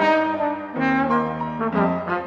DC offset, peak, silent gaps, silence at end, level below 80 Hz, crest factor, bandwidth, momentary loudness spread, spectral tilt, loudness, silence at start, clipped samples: under 0.1%; -6 dBFS; none; 0 s; -52 dBFS; 14 dB; 7.6 kHz; 6 LU; -7.5 dB/octave; -22 LUFS; 0 s; under 0.1%